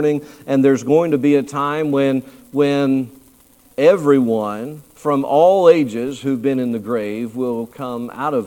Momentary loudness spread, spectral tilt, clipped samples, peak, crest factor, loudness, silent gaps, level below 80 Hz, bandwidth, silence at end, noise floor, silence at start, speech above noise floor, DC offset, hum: 13 LU; -7 dB/octave; under 0.1%; 0 dBFS; 16 dB; -17 LUFS; none; -60 dBFS; 16.5 kHz; 0 s; -50 dBFS; 0 s; 34 dB; under 0.1%; none